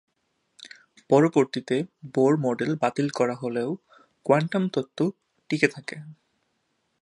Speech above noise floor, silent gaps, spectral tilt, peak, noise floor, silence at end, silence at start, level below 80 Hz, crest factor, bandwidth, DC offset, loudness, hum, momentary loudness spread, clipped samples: 50 dB; none; -6.5 dB/octave; -2 dBFS; -74 dBFS; 0.9 s; 0.6 s; -72 dBFS; 24 dB; 11 kHz; under 0.1%; -25 LUFS; none; 16 LU; under 0.1%